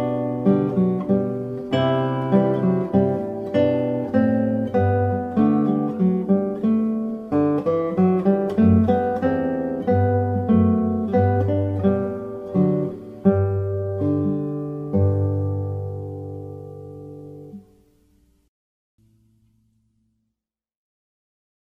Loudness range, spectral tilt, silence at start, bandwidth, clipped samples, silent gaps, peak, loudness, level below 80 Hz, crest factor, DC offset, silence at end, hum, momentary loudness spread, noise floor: 7 LU; -10.5 dB/octave; 0 s; 5.6 kHz; under 0.1%; none; -4 dBFS; -21 LUFS; -54 dBFS; 18 dB; under 0.1%; 4.05 s; none; 11 LU; -83 dBFS